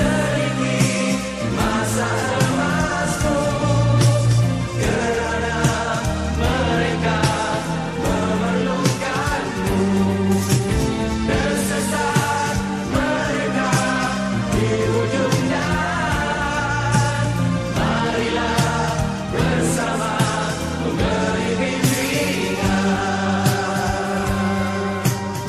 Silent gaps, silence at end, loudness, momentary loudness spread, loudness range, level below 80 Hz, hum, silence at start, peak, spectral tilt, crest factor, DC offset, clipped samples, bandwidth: none; 0 s; -20 LUFS; 3 LU; 2 LU; -34 dBFS; none; 0 s; -4 dBFS; -5 dB/octave; 16 dB; under 0.1%; under 0.1%; 14.5 kHz